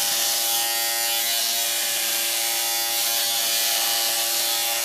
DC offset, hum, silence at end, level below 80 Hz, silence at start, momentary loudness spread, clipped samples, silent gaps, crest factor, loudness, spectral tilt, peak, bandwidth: under 0.1%; none; 0 s; -84 dBFS; 0 s; 2 LU; under 0.1%; none; 16 dB; -20 LUFS; 2.5 dB/octave; -8 dBFS; 16 kHz